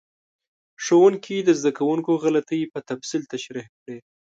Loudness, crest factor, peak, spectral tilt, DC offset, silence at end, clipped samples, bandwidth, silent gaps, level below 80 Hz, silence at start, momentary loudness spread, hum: -22 LUFS; 18 dB; -6 dBFS; -5 dB/octave; under 0.1%; 0.35 s; under 0.1%; 7.8 kHz; 3.69-3.86 s; -74 dBFS; 0.8 s; 21 LU; none